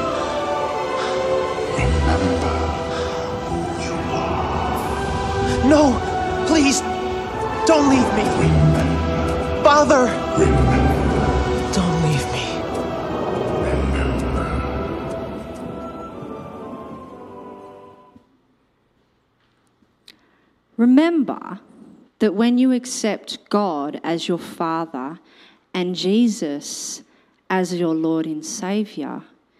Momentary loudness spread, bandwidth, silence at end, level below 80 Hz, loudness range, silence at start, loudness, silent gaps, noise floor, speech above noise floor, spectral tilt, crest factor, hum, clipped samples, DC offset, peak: 16 LU; 14.5 kHz; 0.35 s; -32 dBFS; 11 LU; 0 s; -20 LUFS; none; -63 dBFS; 45 dB; -5.5 dB/octave; 18 dB; none; under 0.1%; under 0.1%; -2 dBFS